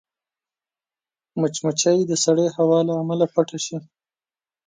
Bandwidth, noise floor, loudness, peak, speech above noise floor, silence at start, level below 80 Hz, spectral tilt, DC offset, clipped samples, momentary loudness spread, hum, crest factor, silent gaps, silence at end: 9.6 kHz; under -90 dBFS; -20 LUFS; -4 dBFS; over 70 dB; 1.35 s; -70 dBFS; -5 dB/octave; under 0.1%; under 0.1%; 10 LU; none; 18 dB; none; 0.85 s